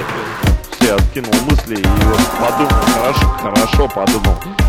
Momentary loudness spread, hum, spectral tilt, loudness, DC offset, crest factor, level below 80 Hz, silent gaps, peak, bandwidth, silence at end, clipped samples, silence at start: 4 LU; none; -5 dB/octave; -14 LUFS; under 0.1%; 14 dB; -18 dBFS; none; 0 dBFS; 17 kHz; 0 s; under 0.1%; 0 s